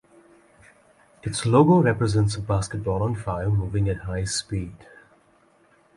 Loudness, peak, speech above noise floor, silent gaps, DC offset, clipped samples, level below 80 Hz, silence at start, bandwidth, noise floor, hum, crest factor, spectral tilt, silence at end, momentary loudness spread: -23 LUFS; -6 dBFS; 37 dB; none; under 0.1%; under 0.1%; -42 dBFS; 1.25 s; 11.5 kHz; -59 dBFS; none; 18 dB; -6 dB/octave; 1.2 s; 13 LU